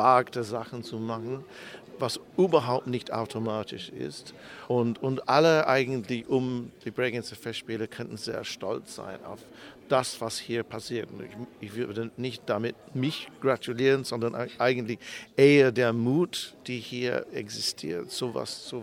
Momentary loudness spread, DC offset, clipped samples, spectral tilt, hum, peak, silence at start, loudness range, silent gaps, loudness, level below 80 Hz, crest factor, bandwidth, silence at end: 16 LU; under 0.1%; under 0.1%; -5 dB/octave; none; -6 dBFS; 0 s; 8 LU; none; -28 LUFS; -70 dBFS; 22 dB; 16.5 kHz; 0 s